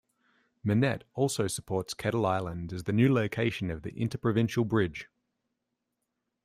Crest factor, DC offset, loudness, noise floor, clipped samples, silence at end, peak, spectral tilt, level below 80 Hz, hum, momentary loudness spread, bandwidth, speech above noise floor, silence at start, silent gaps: 18 dB; under 0.1%; -30 LUFS; -83 dBFS; under 0.1%; 1.4 s; -12 dBFS; -6 dB/octave; -58 dBFS; none; 10 LU; 15.5 kHz; 54 dB; 0.65 s; none